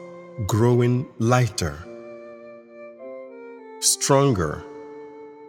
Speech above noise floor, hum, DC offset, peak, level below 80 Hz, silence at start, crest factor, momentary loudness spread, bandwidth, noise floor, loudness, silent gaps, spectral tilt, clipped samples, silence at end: 22 dB; none; under 0.1%; -4 dBFS; -50 dBFS; 0 s; 20 dB; 23 LU; 17 kHz; -43 dBFS; -21 LUFS; none; -5 dB/octave; under 0.1%; 0 s